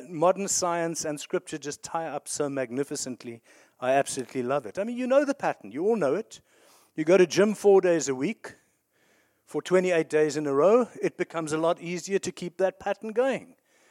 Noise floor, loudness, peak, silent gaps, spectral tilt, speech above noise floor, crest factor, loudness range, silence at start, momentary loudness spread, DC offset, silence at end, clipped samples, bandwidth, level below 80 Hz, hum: -68 dBFS; -26 LUFS; -8 dBFS; none; -4.5 dB/octave; 42 dB; 18 dB; 6 LU; 0 s; 14 LU; under 0.1%; 0.45 s; under 0.1%; 15.5 kHz; -74 dBFS; none